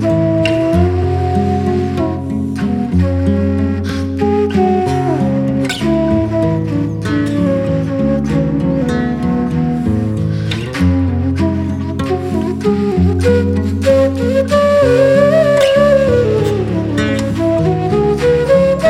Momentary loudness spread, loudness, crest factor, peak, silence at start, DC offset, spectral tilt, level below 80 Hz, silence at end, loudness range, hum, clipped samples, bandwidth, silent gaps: 7 LU; -14 LUFS; 12 dB; -2 dBFS; 0 s; under 0.1%; -7.5 dB/octave; -32 dBFS; 0 s; 5 LU; none; under 0.1%; 13 kHz; none